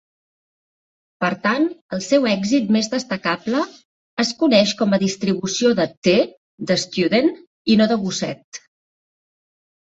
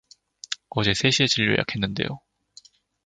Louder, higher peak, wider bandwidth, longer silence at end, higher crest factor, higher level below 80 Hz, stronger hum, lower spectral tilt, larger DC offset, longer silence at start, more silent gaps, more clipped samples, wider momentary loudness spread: first, -19 LUFS vs -23 LUFS; about the same, -4 dBFS vs -4 dBFS; second, 8 kHz vs 9.6 kHz; first, 1.4 s vs 0.85 s; second, 16 dB vs 22 dB; second, -60 dBFS vs -52 dBFS; neither; about the same, -4.5 dB/octave vs -4 dB/octave; neither; first, 1.2 s vs 0.5 s; first, 1.81-1.89 s, 3.85-4.17 s, 5.97-6.02 s, 6.37-6.58 s, 7.47-7.65 s, 8.44-8.52 s vs none; neither; second, 12 LU vs 15 LU